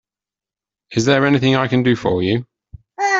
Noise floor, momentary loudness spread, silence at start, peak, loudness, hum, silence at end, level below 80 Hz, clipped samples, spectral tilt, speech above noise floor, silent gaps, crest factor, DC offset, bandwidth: -90 dBFS; 8 LU; 0.9 s; -2 dBFS; -17 LUFS; none; 0 s; -50 dBFS; under 0.1%; -5.5 dB/octave; 74 dB; none; 16 dB; under 0.1%; 7.8 kHz